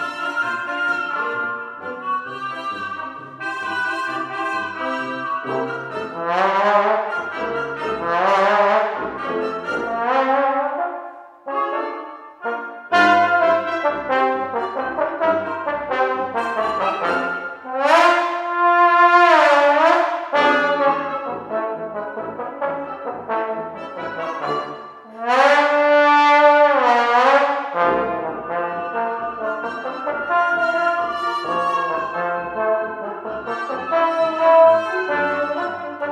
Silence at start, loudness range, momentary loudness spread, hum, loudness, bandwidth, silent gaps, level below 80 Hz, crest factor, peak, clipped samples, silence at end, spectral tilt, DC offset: 0 s; 10 LU; 14 LU; none; -19 LUFS; 11 kHz; none; -62 dBFS; 18 dB; 0 dBFS; under 0.1%; 0 s; -4 dB/octave; under 0.1%